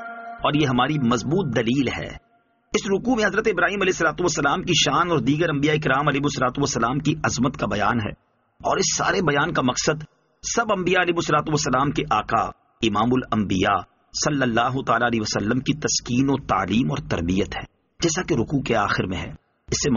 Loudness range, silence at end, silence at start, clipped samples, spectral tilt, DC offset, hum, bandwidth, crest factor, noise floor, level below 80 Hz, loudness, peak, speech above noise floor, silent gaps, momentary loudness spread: 3 LU; 0 s; 0 s; under 0.1%; -4 dB/octave; under 0.1%; none; 7.4 kHz; 16 dB; -55 dBFS; -46 dBFS; -22 LUFS; -6 dBFS; 33 dB; none; 6 LU